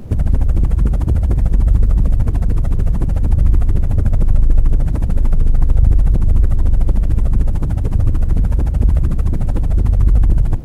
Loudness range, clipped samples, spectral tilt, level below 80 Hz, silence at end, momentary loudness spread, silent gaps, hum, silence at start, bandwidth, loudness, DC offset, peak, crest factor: 1 LU; under 0.1%; -9.5 dB/octave; -12 dBFS; 0 s; 4 LU; none; none; 0 s; 2.6 kHz; -17 LUFS; under 0.1%; 0 dBFS; 10 dB